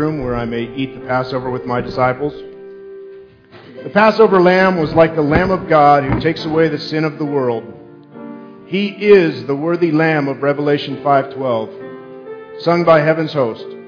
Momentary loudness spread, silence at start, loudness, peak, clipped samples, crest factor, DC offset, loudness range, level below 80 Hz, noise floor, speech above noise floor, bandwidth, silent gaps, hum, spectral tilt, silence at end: 22 LU; 0 s; -15 LUFS; 0 dBFS; under 0.1%; 16 dB; under 0.1%; 7 LU; -42 dBFS; -41 dBFS; 26 dB; 5.4 kHz; none; none; -8 dB/octave; 0 s